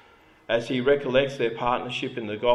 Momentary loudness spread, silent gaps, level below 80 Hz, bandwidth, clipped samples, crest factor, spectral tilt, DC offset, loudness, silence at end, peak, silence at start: 8 LU; none; -52 dBFS; 11.5 kHz; under 0.1%; 18 dB; -5.5 dB/octave; under 0.1%; -25 LUFS; 0 s; -8 dBFS; 0.5 s